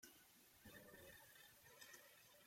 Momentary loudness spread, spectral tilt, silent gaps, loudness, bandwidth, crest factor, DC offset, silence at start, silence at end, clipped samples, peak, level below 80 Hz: 5 LU; -2 dB/octave; none; -64 LUFS; 16.5 kHz; 20 dB; under 0.1%; 0 s; 0 s; under 0.1%; -46 dBFS; -86 dBFS